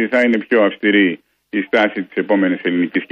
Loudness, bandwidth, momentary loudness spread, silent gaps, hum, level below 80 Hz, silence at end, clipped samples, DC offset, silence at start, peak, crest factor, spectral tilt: -16 LUFS; 7.2 kHz; 9 LU; none; none; -66 dBFS; 0.05 s; under 0.1%; under 0.1%; 0 s; -4 dBFS; 14 dB; -7 dB/octave